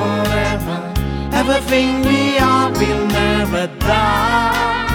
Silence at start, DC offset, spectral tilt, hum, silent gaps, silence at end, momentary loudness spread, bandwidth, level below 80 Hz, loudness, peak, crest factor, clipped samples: 0 s; under 0.1%; -5 dB/octave; none; none; 0 s; 7 LU; 18 kHz; -28 dBFS; -16 LUFS; -2 dBFS; 14 dB; under 0.1%